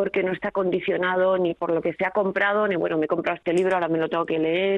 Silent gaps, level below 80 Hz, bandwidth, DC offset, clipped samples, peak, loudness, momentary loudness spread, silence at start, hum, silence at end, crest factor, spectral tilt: none; -62 dBFS; 10 kHz; under 0.1%; under 0.1%; -8 dBFS; -23 LUFS; 4 LU; 0 s; none; 0 s; 14 dB; -6.5 dB/octave